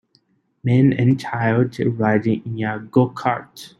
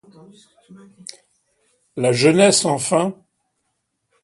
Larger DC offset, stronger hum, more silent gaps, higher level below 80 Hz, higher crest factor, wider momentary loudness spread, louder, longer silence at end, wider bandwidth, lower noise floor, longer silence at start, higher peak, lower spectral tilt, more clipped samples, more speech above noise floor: neither; neither; neither; first, -56 dBFS vs -64 dBFS; about the same, 18 dB vs 20 dB; second, 9 LU vs 25 LU; second, -19 LUFS vs -16 LUFS; second, 0.15 s vs 1.1 s; about the same, 12.5 kHz vs 11.5 kHz; second, -62 dBFS vs -73 dBFS; about the same, 0.65 s vs 0.7 s; about the same, -2 dBFS vs 0 dBFS; first, -8.5 dB/octave vs -4 dB/octave; neither; second, 43 dB vs 54 dB